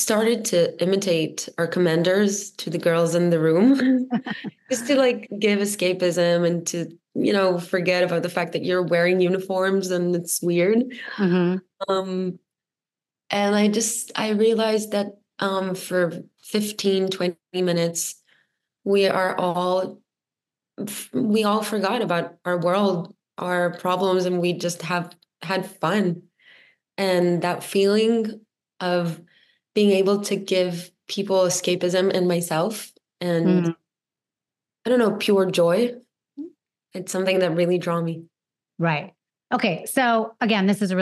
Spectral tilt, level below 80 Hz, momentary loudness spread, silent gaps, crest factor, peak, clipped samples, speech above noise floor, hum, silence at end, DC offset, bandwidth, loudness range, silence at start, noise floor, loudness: -5 dB/octave; -78 dBFS; 11 LU; none; 16 dB; -6 dBFS; under 0.1%; over 69 dB; none; 0 s; under 0.1%; 13 kHz; 4 LU; 0 s; under -90 dBFS; -22 LUFS